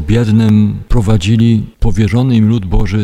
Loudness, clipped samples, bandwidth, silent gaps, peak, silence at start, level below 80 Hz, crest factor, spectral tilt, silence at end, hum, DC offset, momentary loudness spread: -12 LUFS; under 0.1%; 9.8 kHz; none; 0 dBFS; 0 s; -20 dBFS; 10 dB; -7.5 dB/octave; 0 s; none; under 0.1%; 5 LU